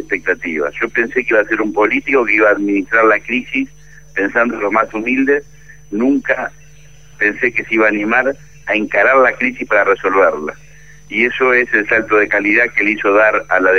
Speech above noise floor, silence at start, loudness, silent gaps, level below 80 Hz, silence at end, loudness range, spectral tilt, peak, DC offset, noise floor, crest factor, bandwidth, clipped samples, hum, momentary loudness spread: 29 dB; 0 s; -14 LUFS; none; -48 dBFS; 0 s; 3 LU; -5.5 dB/octave; 0 dBFS; 0.9%; -43 dBFS; 14 dB; 7.2 kHz; under 0.1%; none; 8 LU